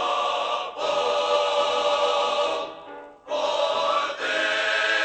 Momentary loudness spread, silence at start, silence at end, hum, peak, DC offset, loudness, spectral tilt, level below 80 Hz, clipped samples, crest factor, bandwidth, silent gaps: 9 LU; 0 s; 0 s; none; -10 dBFS; under 0.1%; -23 LUFS; -0.5 dB/octave; -68 dBFS; under 0.1%; 14 dB; 9 kHz; none